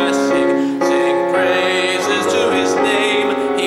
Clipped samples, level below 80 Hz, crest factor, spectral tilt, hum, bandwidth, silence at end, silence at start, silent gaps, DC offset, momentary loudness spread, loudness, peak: under 0.1%; -60 dBFS; 12 dB; -3.5 dB/octave; none; 13.5 kHz; 0 s; 0 s; none; under 0.1%; 2 LU; -15 LUFS; -4 dBFS